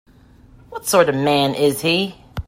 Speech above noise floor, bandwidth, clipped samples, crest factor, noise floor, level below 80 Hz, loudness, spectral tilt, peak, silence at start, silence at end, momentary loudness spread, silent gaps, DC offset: 30 dB; 16.5 kHz; under 0.1%; 18 dB; -48 dBFS; -44 dBFS; -18 LUFS; -4 dB/octave; 0 dBFS; 0.7 s; 0.05 s; 11 LU; none; under 0.1%